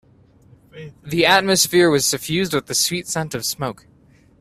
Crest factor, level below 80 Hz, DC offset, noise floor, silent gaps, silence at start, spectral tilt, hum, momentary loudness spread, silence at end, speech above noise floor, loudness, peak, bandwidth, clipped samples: 20 dB; -54 dBFS; under 0.1%; -51 dBFS; none; 0.75 s; -3 dB/octave; none; 14 LU; 0.7 s; 32 dB; -18 LUFS; 0 dBFS; 16 kHz; under 0.1%